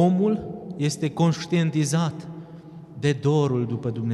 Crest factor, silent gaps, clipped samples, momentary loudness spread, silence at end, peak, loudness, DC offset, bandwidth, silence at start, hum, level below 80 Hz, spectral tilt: 14 dB; none; under 0.1%; 18 LU; 0 s; -8 dBFS; -24 LUFS; under 0.1%; 12.5 kHz; 0 s; none; -58 dBFS; -6.5 dB/octave